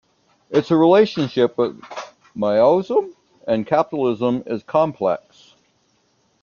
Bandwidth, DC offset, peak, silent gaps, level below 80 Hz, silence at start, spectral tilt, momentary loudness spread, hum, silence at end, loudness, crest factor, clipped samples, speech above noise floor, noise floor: 7.2 kHz; under 0.1%; -2 dBFS; none; -62 dBFS; 0.5 s; -7.5 dB/octave; 19 LU; none; 1.25 s; -19 LUFS; 18 dB; under 0.1%; 45 dB; -63 dBFS